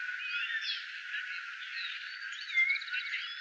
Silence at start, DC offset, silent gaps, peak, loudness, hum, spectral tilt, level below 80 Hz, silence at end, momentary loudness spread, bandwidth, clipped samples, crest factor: 0 s; under 0.1%; none; -20 dBFS; -34 LUFS; none; 9.5 dB/octave; under -90 dBFS; 0 s; 11 LU; 9 kHz; under 0.1%; 16 dB